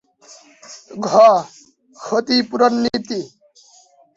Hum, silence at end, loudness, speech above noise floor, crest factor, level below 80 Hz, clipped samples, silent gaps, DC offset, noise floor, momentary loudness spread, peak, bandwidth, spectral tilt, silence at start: none; 0.9 s; -16 LUFS; 35 dB; 18 dB; -60 dBFS; under 0.1%; none; under 0.1%; -51 dBFS; 25 LU; -2 dBFS; 7.8 kHz; -4 dB/octave; 0.7 s